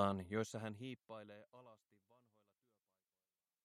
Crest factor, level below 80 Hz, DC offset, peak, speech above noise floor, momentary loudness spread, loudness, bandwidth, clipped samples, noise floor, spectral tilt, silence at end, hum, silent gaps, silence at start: 26 dB; -84 dBFS; under 0.1%; -22 dBFS; over 44 dB; 22 LU; -46 LUFS; 13.5 kHz; under 0.1%; under -90 dBFS; -6 dB/octave; 1.9 s; none; none; 0 s